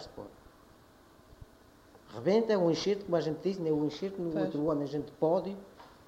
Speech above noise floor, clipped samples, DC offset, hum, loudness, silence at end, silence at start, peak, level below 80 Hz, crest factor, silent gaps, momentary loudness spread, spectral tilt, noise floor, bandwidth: 28 dB; under 0.1%; under 0.1%; none; -31 LUFS; 0.2 s; 0 s; -14 dBFS; -64 dBFS; 18 dB; none; 19 LU; -6.5 dB/octave; -59 dBFS; 15.5 kHz